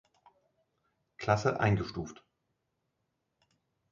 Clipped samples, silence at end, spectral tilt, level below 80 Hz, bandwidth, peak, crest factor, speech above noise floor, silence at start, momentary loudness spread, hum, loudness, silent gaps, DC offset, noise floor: under 0.1%; 1.8 s; -6.5 dB/octave; -58 dBFS; 7.4 kHz; -12 dBFS; 24 dB; 52 dB; 1.2 s; 14 LU; none; -31 LUFS; none; under 0.1%; -82 dBFS